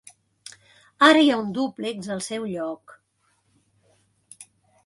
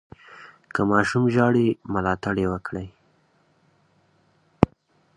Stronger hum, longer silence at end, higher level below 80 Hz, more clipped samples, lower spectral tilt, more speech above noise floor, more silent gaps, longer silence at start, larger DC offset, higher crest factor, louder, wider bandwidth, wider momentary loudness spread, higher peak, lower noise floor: neither; about the same, 0.45 s vs 0.5 s; second, -70 dBFS vs -48 dBFS; neither; second, -4 dB/octave vs -7.5 dB/octave; first, 47 dB vs 41 dB; neither; first, 1 s vs 0.3 s; neither; about the same, 22 dB vs 24 dB; about the same, -22 LUFS vs -23 LUFS; about the same, 11.5 kHz vs 11 kHz; first, 29 LU vs 16 LU; second, -4 dBFS vs 0 dBFS; first, -68 dBFS vs -63 dBFS